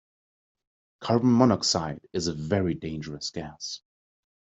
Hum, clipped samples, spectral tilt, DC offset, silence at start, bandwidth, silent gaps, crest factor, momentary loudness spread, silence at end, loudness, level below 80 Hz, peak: none; under 0.1%; -5 dB/octave; under 0.1%; 1 s; 8.2 kHz; none; 24 dB; 16 LU; 0.65 s; -26 LUFS; -58 dBFS; -4 dBFS